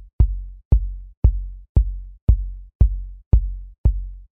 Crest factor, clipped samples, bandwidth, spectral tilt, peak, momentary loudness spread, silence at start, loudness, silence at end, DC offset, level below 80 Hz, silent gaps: 18 dB; under 0.1%; 1.3 kHz; -12.5 dB/octave; -2 dBFS; 12 LU; 0 s; -23 LUFS; 0.1 s; under 0.1%; -20 dBFS; 0.13-0.19 s, 0.65-0.71 s, 1.17-1.22 s, 1.69-1.75 s, 2.22-2.27 s, 2.75-2.80 s, 3.26-3.31 s, 3.78-3.84 s